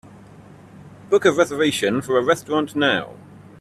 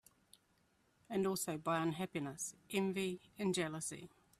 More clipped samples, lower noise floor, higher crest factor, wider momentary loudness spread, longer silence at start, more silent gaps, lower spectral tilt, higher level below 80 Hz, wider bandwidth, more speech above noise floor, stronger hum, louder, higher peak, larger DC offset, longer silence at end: neither; second, -44 dBFS vs -76 dBFS; about the same, 20 dB vs 18 dB; about the same, 5 LU vs 7 LU; second, 0.75 s vs 1.1 s; neither; about the same, -4.5 dB/octave vs -4.5 dB/octave; first, -60 dBFS vs -76 dBFS; second, 14 kHz vs 15.5 kHz; second, 25 dB vs 36 dB; neither; first, -19 LUFS vs -40 LUFS; first, -2 dBFS vs -22 dBFS; neither; about the same, 0.25 s vs 0.35 s